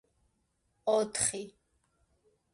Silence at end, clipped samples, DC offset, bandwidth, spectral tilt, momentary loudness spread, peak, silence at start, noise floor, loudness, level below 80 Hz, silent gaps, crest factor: 1.05 s; under 0.1%; under 0.1%; 11.5 kHz; -2 dB/octave; 15 LU; -14 dBFS; 0.85 s; -77 dBFS; -31 LUFS; -68 dBFS; none; 22 dB